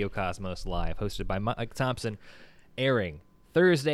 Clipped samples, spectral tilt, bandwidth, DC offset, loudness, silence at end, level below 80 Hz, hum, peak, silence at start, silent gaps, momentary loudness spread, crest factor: under 0.1%; -6 dB/octave; 13.5 kHz; under 0.1%; -30 LUFS; 0 s; -42 dBFS; none; -12 dBFS; 0 s; none; 13 LU; 18 dB